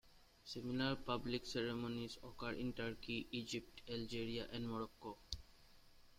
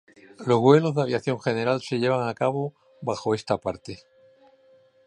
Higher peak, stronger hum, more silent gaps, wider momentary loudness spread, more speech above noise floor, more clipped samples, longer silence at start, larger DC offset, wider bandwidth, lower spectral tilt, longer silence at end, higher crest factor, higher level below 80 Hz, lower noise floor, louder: second, -24 dBFS vs -4 dBFS; neither; neither; second, 10 LU vs 16 LU; second, 20 dB vs 34 dB; neither; second, 0.05 s vs 0.4 s; neither; first, 16 kHz vs 10.5 kHz; second, -5 dB/octave vs -7 dB/octave; second, 0.05 s vs 1.1 s; about the same, 22 dB vs 22 dB; about the same, -62 dBFS vs -62 dBFS; first, -65 dBFS vs -58 dBFS; second, -45 LUFS vs -24 LUFS